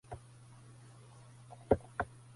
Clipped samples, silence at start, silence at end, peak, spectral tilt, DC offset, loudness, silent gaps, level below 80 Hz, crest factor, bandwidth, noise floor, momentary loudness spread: under 0.1%; 0.1 s; 0.3 s; -12 dBFS; -7.5 dB/octave; under 0.1%; -36 LUFS; none; -56 dBFS; 28 dB; 11.5 kHz; -57 dBFS; 23 LU